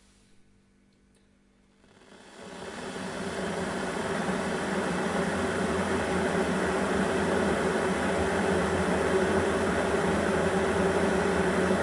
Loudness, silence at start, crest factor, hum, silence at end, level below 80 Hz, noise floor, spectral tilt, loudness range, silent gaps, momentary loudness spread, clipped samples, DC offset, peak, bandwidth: -28 LUFS; 2.1 s; 16 dB; none; 0 s; -50 dBFS; -63 dBFS; -5 dB/octave; 11 LU; none; 8 LU; under 0.1%; under 0.1%; -14 dBFS; 11.5 kHz